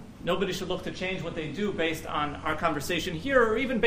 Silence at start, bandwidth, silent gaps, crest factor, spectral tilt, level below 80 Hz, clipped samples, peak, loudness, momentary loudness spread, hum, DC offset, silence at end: 0 s; 15.5 kHz; none; 20 dB; -5 dB/octave; -48 dBFS; under 0.1%; -8 dBFS; -29 LUFS; 8 LU; none; under 0.1%; 0 s